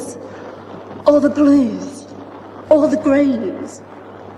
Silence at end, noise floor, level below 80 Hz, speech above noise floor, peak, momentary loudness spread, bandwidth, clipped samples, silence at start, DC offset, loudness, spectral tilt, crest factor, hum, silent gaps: 0 s; -34 dBFS; -58 dBFS; 20 dB; 0 dBFS; 22 LU; 11.5 kHz; under 0.1%; 0 s; under 0.1%; -15 LUFS; -6.5 dB/octave; 16 dB; none; none